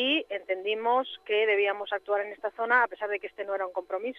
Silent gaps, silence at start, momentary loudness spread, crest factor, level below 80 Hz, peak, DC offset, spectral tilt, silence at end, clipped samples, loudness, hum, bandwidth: none; 0 s; 9 LU; 18 dB; -78 dBFS; -10 dBFS; under 0.1%; -4 dB/octave; 0 s; under 0.1%; -28 LUFS; none; 5.4 kHz